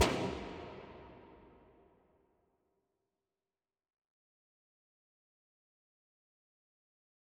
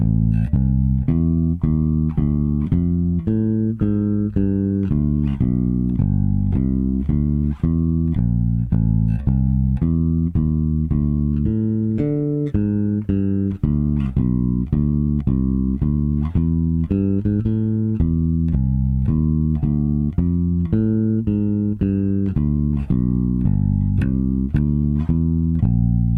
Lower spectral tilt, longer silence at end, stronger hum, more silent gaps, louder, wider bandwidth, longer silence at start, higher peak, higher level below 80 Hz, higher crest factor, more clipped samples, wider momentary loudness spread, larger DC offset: second, -4 dB/octave vs -12.5 dB/octave; first, 5.9 s vs 0 s; neither; neither; second, -40 LUFS vs -20 LUFS; first, 10.5 kHz vs 3.6 kHz; about the same, 0 s vs 0 s; second, -16 dBFS vs -6 dBFS; second, -62 dBFS vs -26 dBFS; first, 30 dB vs 12 dB; neither; first, 24 LU vs 2 LU; neither